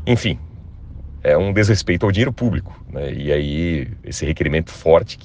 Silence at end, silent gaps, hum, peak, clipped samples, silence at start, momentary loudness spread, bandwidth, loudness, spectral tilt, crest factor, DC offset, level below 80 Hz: 0 s; none; none; 0 dBFS; under 0.1%; 0 s; 18 LU; 9.6 kHz; -19 LUFS; -6 dB/octave; 18 dB; under 0.1%; -34 dBFS